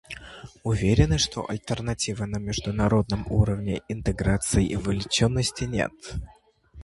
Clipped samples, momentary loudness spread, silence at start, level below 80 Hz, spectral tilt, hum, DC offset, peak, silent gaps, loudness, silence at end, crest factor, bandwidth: under 0.1%; 12 LU; 0.1 s; -36 dBFS; -5 dB/octave; none; under 0.1%; -6 dBFS; none; -25 LUFS; 0 s; 20 dB; 11.5 kHz